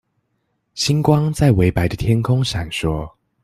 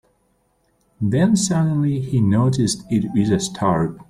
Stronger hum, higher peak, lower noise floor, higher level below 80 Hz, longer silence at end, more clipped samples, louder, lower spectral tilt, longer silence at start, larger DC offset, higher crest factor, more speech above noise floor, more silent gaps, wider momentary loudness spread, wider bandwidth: neither; first, -2 dBFS vs -6 dBFS; first, -70 dBFS vs -64 dBFS; first, -36 dBFS vs -48 dBFS; first, 0.35 s vs 0.05 s; neither; about the same, -18 LUFS vs -19 LUFS; about the same, -6 dB/octave vs -6 dB/octave; second, 0.75 s vs 1 s; neither; about the same, 16 dB vs 14 dB; first, 53 dB vs 46 dB; neither; first, 10 LU vs 4 LU; first, 15 kHz vs 13 kHz